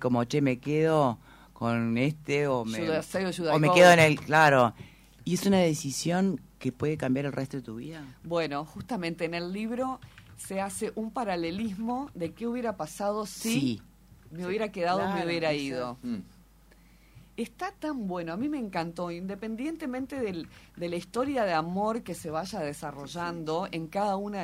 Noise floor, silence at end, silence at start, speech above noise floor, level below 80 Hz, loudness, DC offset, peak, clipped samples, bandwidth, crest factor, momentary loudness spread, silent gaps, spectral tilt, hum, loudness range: -57 dBFS; 0 s; 0 s; 29 dB; -60 dBFS; -28 LUFS; under 0.1%; -6 dBFS; under 0.1%; 16 kHz; 22 dB; 13 LU; none; -5.5 dB/octave; none; 12 LU